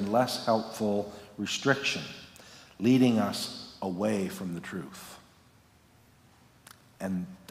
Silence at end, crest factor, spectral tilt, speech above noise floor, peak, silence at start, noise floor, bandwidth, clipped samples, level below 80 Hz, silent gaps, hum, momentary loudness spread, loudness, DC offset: 0.15 s; 22 dB; -5 dB/octave; 31 dB; -8 dBFS; 0 s; -61 dBFS; 16 kHz; under 0.1%; -68 dBFS; none; none; 20 LU; -30 LUFS; under 0.1%